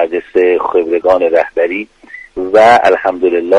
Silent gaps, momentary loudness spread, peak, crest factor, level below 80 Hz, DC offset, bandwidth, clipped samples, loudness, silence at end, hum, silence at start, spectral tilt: none; 15 LU; 0 dBFS; 10 dB; -48 dBFS; under 0.1%; 11 kHz; 0.1%; -11 LUFS; 0 s; none; 0 s; -5 dB/octave